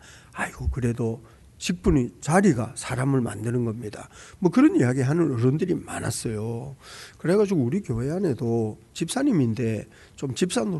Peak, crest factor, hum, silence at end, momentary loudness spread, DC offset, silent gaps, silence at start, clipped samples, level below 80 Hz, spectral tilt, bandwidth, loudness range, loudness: -8 dBFS; 18 dB; none; 0 s; 15 LU; under 0.1%; none; 0.05 s; under 0.1%; -42 dBFS; -6.5 dB/octave; 12 kHz; 3 LU; -25 LUFS